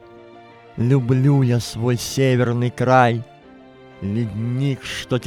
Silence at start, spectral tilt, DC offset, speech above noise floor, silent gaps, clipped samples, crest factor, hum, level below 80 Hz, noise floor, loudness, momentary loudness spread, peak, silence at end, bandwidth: 0.15 s; -6.5 dB/octave; under 0.1%; 26 dB; none; under 0.1%; 18 dB; none; -52 dBFS; -45 dBFS; -19 LUFS; 11 LU; -2 dBFS; 0 s; 14.5 kHz